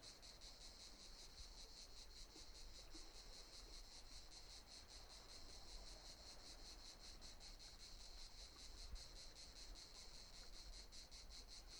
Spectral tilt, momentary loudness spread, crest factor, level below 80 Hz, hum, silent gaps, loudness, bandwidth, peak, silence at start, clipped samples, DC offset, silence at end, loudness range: -1.5 dB/octave; 1 LU; 16 dB; -62 dBFS; none; none; -59 LUFS; 19.5 kHz; -42 dBFS; 0 s; under 0.1%; under 0.1%; 0 s; 1 LU